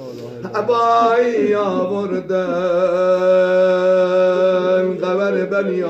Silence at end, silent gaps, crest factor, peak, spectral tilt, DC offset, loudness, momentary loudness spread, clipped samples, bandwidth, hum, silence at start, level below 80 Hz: 0 s; none; 12 dB; -4 dBFS; -6.5 dB/octave; under 0.1%; -16 LUFS; 7 LU; under 0.1%; 8 kHz; none; 0 s; -62 dBFS